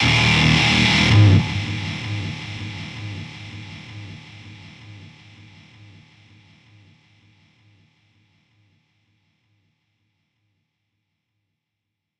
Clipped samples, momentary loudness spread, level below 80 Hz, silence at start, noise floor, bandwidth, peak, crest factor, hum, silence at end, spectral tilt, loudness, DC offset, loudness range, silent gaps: under 0.1%; 27 LU; -42 dBFS; 0 s; -81 dBFS; 10.5 kHz; -2 dBFS; 20 dB; none; 7.1 s; -5 dB/octave; -17 LUFS; under 0.1%; 27 LU; none